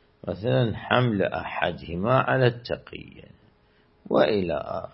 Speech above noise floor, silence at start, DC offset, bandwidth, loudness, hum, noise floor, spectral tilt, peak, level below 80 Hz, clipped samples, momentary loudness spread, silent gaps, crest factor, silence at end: 36 dB; 0.25 s; under 0.1%; 5.8 kHz; -25 LUFS; none; -61 dBFS; -11 dB/octave; -2 dBFS; -54 dBFS; under 0.1%; 12 LU; none; 22 dB; 0.05 s